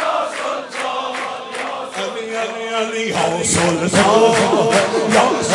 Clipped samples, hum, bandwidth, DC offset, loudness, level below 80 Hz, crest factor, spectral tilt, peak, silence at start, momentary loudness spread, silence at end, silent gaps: under 0.1%; none; 11.5 kHz; under 0.1%; -17 LUFS; -56 dBFS; 16 dB; -3.5 dB/octave; 0 dBFS; 0 s; 12 LU; 0 s; none